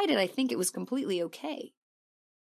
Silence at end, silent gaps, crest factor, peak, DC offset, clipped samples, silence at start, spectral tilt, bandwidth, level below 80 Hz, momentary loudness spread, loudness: 0.85 s; none; 18 dB; -14 dBFS; under 0.1%; under 0.1%; 0 s; -3.5 dB/octave; 14.5 kHz; -88 dBFS; 12 LU; -31 LUFS